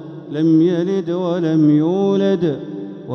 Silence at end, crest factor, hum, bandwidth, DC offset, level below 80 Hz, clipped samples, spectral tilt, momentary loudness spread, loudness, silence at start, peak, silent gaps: 0 s; 12 dB; none; 6.4 kHz; under 0.1%; -62 dBFS; under 0.1%; -9 dB/octave; 13 LU; -17 LUFS; 0 s; -4 dBFS; none